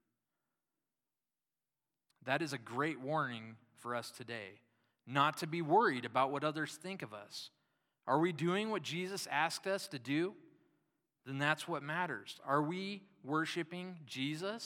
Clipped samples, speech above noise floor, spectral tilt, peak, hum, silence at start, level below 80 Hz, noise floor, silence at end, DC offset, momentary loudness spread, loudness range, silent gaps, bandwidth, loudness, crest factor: under 0.1%; over 53 dB; -5 dB/octave; -16 dBFS; none; 2.25 s; under -90 dBFS; under -90 dBFS; 0 s; under 0.1%; 14 LU; 5 LU; none; 17 kHz; -37 LUFS; 24 dB